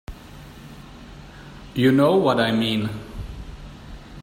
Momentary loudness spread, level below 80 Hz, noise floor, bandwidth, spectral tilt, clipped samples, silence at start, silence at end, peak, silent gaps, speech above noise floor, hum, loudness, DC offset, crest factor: 25 LU; -42 dBFS; -42 dBFS; 16 kHz; -6.5 dB/octave; under 0.1%; 0.1 s; 0 s; -6 dBFS; none; 23 dB; none; -20 LUFS; under 0.1%; 18 dB